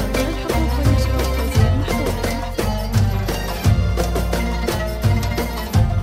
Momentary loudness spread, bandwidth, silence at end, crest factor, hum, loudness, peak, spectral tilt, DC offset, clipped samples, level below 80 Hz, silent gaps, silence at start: 5 LU; 16 kHz; 0 s; 14 dB; none; -20 LUFS; -4 dBFS; -6 dB/octave; under 0.1%; under 0.1%; -22 dBFS; none; 0 s